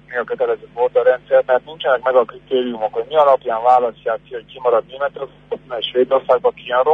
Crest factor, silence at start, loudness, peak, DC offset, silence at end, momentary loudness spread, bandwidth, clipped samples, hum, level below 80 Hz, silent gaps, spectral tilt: 14 dB; 0.1 s; -17 LUFS; -2 dBFS; under 0.1%; 0 s; 10 LU; 4.9 kHz; under 0.1%; 50 Hz at -50 dBFS; -58 dBFS; none; -6 dB/octave